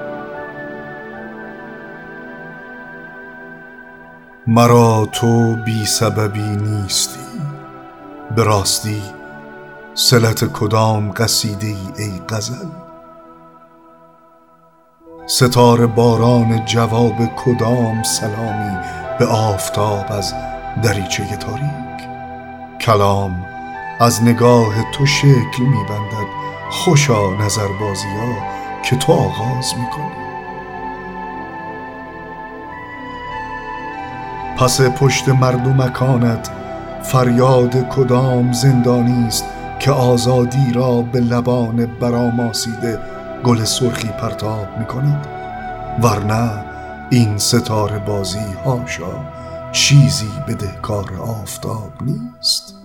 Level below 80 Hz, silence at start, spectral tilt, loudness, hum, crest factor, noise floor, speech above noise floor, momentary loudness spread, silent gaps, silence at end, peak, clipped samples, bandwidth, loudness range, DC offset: -42 dBFS; 0 s; -5 dB/octave; -16 LUFS; none; 16 dB; -50 dBFS; 35 dB; 18 LU; none; 0 s; 0 dBFS; under 0.1%; 18 kHz; 10 LU; 0.1%